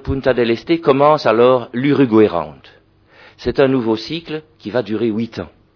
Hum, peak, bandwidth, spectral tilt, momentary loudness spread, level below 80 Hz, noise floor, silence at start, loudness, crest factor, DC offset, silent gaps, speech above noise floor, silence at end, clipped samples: none; 0 dBFS; 5.4 kHz; -7.5 dB/octave; 13 LU; -42 dBFS; -48 dBFS; 0.05 s; -16 LUFS; 16 dB; under 0.1%; none; 33 dB; 0.3 s; under 0.1%